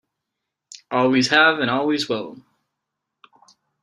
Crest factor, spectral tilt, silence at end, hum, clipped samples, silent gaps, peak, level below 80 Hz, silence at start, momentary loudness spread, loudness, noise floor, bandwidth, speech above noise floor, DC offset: 22 dB; -4 dB/octave; 1.5 s; none; under 0.1%; none; 0 dBFS; -68 dBFS; 0.9 s; 12 LU; -19 LUFS; -82 dBFS; 12 kHz; 63 dB; under 0.1%